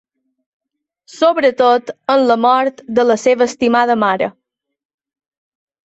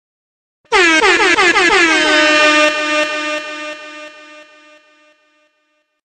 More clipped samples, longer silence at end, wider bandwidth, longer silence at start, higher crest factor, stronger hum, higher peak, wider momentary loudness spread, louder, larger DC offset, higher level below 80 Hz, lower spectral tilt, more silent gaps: neither; about the same, 1.55 s vs 1.65 s; second, 8.2 kHz vs 9.4 kHz; first, 1.15 s vs 0.7 s; about the same, 14 dB vs 14 dB; neither; about the same, -2 dBFS vs 0 dBFS; second, 5 LU vs 17 LU; second, -14 LUFS vs -11 LUFS; neither; second, -60 dBFS vs -48 dBFS; first, -4.5 dB/octave vs -1 dB/octave; neither